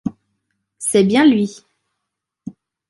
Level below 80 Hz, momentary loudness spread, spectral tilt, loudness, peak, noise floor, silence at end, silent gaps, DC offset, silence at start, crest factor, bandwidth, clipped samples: -60 dBFS; 24 LU; -5 dB/octave; -15 LUFS; -2 dBFS; -79 dBFS; 0.4 s; none; under 0.1%; 0.05 s; 16 dB; 11.5 kHz; under 0.1%